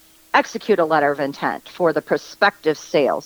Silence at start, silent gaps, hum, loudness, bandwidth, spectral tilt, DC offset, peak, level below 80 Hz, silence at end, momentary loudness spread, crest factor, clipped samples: 0.35 s; none; none; -20 LUFS; over 20 kHz; -4.5 dB/octave; under 0.1%; -2 dBFS; -66 dBFS; 0 s; 6 LU; 16 dB; under 0.1%